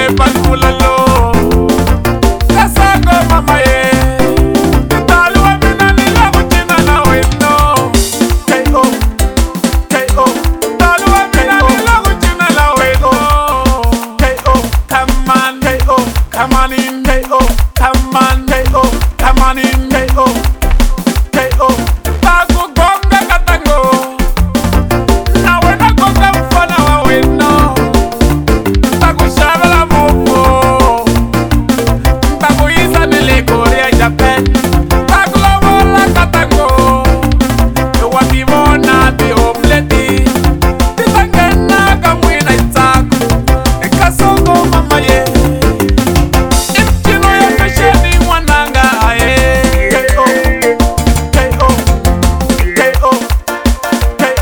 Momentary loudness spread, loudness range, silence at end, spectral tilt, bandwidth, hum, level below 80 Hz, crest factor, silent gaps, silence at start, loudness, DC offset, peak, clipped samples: 4 LU; 2 LU; 0 s; -5 dB/octave; over 20 kHz; none; -14 dBFS; 8 dB; none; 0 s; -9 LUFS; under 0.1%; 0 dBFS; 0.4%